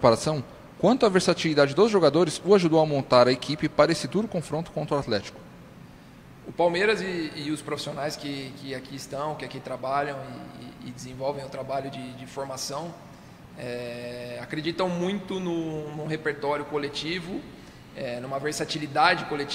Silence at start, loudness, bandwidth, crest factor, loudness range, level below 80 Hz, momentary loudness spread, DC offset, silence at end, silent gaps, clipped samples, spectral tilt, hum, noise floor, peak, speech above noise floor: 0 s; -26 LUFS; 16 kHz; 22 dB; 13 LU; -58 dBFS; 18 LU; under 0.1%; 0 s; none; under 0.1%; -5 dB/octave; none; -48 dBFS; -4 dBFS; 22 dB